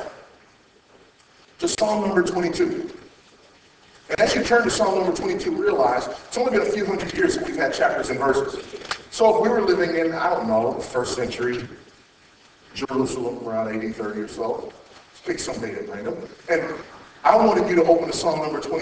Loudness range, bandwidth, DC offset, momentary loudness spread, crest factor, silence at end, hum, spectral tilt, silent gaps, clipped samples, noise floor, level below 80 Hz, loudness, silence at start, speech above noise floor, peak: 7 LU; 8 kHz; under 0.1%; 13 LU; 22 dB; 0 s; none; -4.5 dB/octave; none; under 0.1%; -55 dBFS; -52 dBFS; -22 LUFS; 0 s; 33 dB; 0 dBFS